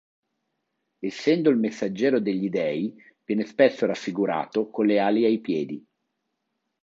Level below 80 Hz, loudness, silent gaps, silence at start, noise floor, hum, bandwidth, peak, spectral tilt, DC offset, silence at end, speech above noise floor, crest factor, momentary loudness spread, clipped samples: -74 dBFS; -24 LUFS; none; 1 s; -79 dBFS; none; 7.8 kHz; -6 dBFS; -6.5 dB/octave; under 0.1%; 1.05 s; 55 dB; 20 dB; 10 LU; under 0.1%